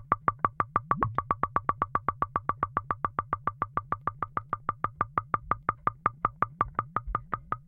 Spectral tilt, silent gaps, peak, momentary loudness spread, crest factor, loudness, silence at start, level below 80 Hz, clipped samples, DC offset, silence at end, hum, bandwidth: -10 dB/octave; none; -8 dBFS; 5 LU; 24 dB; -31 LUFS; 0 s; -50 dBFS; under 0.1%; under 0.1%; 0.05 s; none; 4.3 kHz